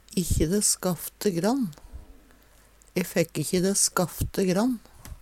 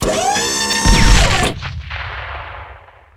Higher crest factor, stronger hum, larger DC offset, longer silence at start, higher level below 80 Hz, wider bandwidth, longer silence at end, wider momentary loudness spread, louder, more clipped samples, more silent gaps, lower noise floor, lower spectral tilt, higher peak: about the same, 18 dB vs 16 dB; neither; neither; about the same, 0.1 s vs 0 s; second, -40 dBFS vs -20 dBFS; about the same, 17 kHz vs 15.5 kHz; second, 0.05 s vs 0.4 s; second, 9 LU vs 17 LU; second, -26 LUFS vs -15 LUFS; neither; neither; first, -56 dBFS vs -40 dBFS; about the same, -4 dB/octave vs -3 dB/octave; second, -8 dBFS vs 0 dBFS